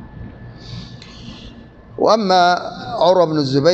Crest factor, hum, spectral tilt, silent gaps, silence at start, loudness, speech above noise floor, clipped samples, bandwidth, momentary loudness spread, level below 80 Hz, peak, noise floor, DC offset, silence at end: 16 dB; none; -5.5 dB/octave; none; 0 s; -15 LUFS; 26 dB; under 0.1%; 8.2 kHz; 23 LU; -46 dBFS; -2 dBFS; -39 dBFS; under 0.1%; 0 s